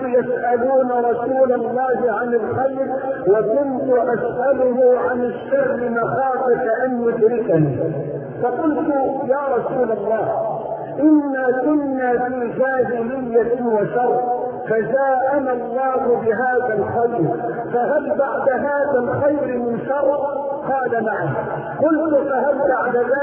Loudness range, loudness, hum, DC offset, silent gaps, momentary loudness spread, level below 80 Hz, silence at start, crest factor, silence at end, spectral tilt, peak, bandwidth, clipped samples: 2 LU; -19 LUFS; none; under 0.1%; none; 6 LU; -56 dBFS; 0 s; 14 dB; 0 s; -12.5 dB/octave; -4 dBFS; 3.3 kHz; under 0.1%